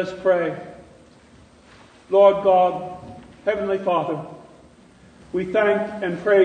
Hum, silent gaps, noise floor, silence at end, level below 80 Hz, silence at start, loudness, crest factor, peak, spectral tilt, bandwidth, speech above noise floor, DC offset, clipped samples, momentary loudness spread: none; none; -50 dBFS; 0 s; -58 dBFS; 0 s; -21 LUFS; 18 dB; -4 dBFS; -7 dB/octave; 9.4 kHz; 31 dB; under 0.1%; under 0.1%; 20 LU